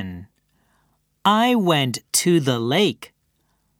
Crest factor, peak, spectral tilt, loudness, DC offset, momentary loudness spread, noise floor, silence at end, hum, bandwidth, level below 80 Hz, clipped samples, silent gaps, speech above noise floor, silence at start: 20 dB; -2 dBFS; -4 dB/octave; -19 LUFS; under 0.1%; 15 LU; -67 dBFS; 0.75 s; none; 18 kHz; -64 dBFS; under 0.1%; none; 49 dB; 0 s